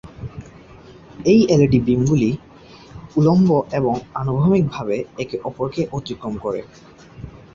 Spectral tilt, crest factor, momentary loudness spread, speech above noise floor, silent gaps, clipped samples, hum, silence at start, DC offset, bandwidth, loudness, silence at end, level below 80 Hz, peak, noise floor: -8 dB/octave; 16 dB; 20 LU; 25 dB; none; under 0.1%; none; 0.05 s; under 0.1%; 7.4 kHz; -19 LUFS; 0.2 s; -46 dBFS; -2 dBFS; -43 dBFS